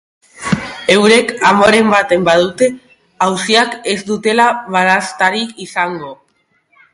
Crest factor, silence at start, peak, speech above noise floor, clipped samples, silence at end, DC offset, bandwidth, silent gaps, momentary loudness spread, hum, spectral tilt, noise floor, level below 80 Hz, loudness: 14 dB; 0.4 s; 0 dBFS; 48 dB; under 0.1%; 0.8 s; under 0.1%; 11.5 kHz; none; 11 LU; none; -4 dB/octave; -60 dBFS; -50 dBFS; -12 LUFS